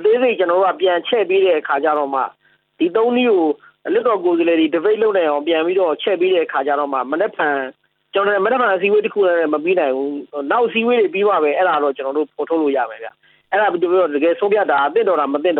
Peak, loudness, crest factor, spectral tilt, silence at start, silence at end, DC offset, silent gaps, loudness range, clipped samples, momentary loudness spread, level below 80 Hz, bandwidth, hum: -4 dBFS; -17 LUFS; 12 dB; -8 dB/octave; 0 s; 0 s; under 0.1%; none; 1 LU; under 0.1%; 6 LU; -74 dBFS; 4.3 kHz; none